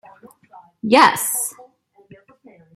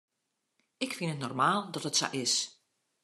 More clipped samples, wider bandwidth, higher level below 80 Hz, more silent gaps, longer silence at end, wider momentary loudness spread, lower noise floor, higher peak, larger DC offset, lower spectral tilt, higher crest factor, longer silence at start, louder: neither; first, 16.5 kHz vs 13 kHz; first, -66 dBFS vs -80 dBFS; neither; first, 1.15 s vs 0.5 s; first, 15 LU vs 9 LU; second, -51 dBFS vs -83 dBFS; first, -2 dBFS vs -14 dBFS; neither; about the same, -2 dB/octave vs -2.5 dB/octave; about the same, 20 dB vs 20 dB; about the same, 0.85 s vs 0.8 s; first, -16 LUFS vs -31 LUFS